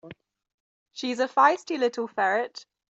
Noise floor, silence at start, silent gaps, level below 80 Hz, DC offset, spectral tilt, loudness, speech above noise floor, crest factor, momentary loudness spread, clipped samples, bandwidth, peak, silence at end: -49 dBFS; 0.05 s; 0.54-0.86 s; -78 dBFS; under 0.1%; -3.5 dB/octave; -25 LUFS; 24 dB; 20 dB; 16 LU; under 0.1%; 8.2 kHz; -6 dBFS; 0.35 s